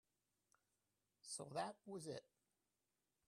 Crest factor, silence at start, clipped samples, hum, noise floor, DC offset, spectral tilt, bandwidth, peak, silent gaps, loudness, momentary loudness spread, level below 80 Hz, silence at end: 24 dB; 1.25 s; under 0.1%; 50 Hz at -80 dBFS; under -90 dBFS; under 0.1%; -3.5 dB/octave; 13.5 kHz; -32 dBFS; none; -51 LUFS; 8 LU; under -90 dBFS; 1.05 s